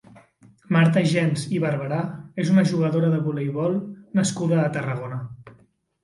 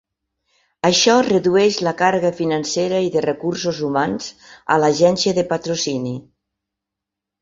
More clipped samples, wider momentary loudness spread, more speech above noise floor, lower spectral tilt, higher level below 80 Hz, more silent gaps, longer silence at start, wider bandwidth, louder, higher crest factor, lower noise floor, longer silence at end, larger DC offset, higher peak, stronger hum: neither; about the same, 11 LU vs 10 LU; second, 37 dB vs 66 dB; first, -6.5 dB/octave vs -4 dB/octave; about the same, -62 dBFS vs -58 dBFS; neither; second, 0.7 s vs 0.85 s; first, 11.5 kHz vs 7.8 kHz; second, -23 LUFS vs -18 LUFS; about the same, 16 dB vs 18 dB; second, -58 dBFS vs -84 dBFS; second, 0.55 s vs 1.2 s; neither; second, -8 dBFS vs -2 dBFS; neither